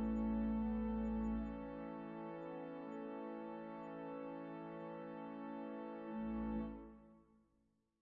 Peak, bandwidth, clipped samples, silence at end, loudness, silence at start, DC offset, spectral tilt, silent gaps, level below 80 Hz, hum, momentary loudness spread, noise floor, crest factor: -32 dBFS; 4.2 kHz; under 0.1%; 0.8 s; -45 LUFS; 0 s; under 0.1%; -8 dB/octave; none; -56 dBFS; none; 10 LU; -81 dBFS; 14 dB